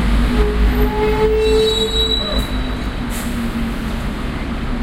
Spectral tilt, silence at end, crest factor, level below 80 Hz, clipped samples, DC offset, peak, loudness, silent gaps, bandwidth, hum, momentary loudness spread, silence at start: -5.5 dB/octave; 0 s; 14 dB; -20 dBFS; under 0.1%; under 0.1%; -2 dBFS; -18 LUFS; none; 16 kHz; none; 9 LU; 0 s